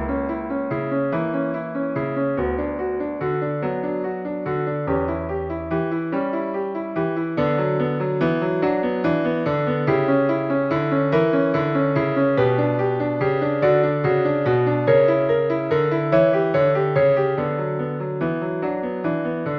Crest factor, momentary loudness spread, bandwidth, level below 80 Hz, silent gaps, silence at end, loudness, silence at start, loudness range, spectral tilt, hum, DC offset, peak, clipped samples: 16 dB; 7 LU; 5.8 kHz; -46 dBFS; none; 0 s; -21 LUFS; 0 s; 6 LU; -10 dB/octave; none; under 0.1%; -6 dBFS; under 0.1%